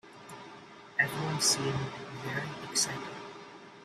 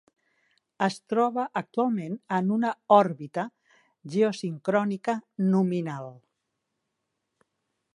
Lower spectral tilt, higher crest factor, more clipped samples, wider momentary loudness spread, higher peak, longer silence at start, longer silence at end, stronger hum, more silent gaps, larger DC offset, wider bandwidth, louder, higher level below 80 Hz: second, -2.5 dB/octave vs -7 dB/octave; about the same, 22 dB vs 22 dB; neither; first, 22 LU vs 13 LU; second, -12 dBFS vs -6 dBFS; second, 0.05 s vs 0.8 s; second, 0 s vs 1.8 s; neither; neither; neither; first, 15.5 kHz vs 11 kHz; second, -31 LUFS vs -26 LUFS; first, -68 dBFS vs -80 dBFS